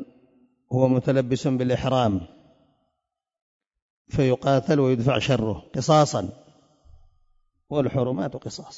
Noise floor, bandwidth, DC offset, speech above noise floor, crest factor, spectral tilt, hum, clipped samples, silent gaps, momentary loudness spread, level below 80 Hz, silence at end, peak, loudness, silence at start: -82 dBFS; 7.8 kHz; under 0.1%; 60 dB; 20 dB; -6.5 dB/octave; none; under 0.1%; 3.42-3.60 s, 3.82-4.05 s; 11 LU; -52 dBFS; 0 s; -6 dBFS; -23 LUFS; 0 s